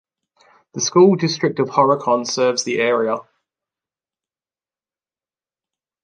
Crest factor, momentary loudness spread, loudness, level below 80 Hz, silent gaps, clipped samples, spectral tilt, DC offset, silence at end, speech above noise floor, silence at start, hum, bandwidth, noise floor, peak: 18 dB; 10 LU; -17 LUFS; -70 dBFS; none; under 0.1%; -4.5 dB/octave; under 0.1%; 2.8 s; over 73 dB; 0.75 s; none; 9.8 kHz; under -90 dBFS; -2 dBFS